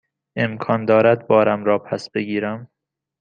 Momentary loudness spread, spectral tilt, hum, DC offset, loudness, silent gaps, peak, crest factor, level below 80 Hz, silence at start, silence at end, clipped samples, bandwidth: 12 LU; -7.5 dB/octave; none; under 0.1%; -19 LUFS; none; -2 dBFS; 18 dB; -64 dBFS; 0.35 s; 0.55 s; under 0.1%; 8.8 kHz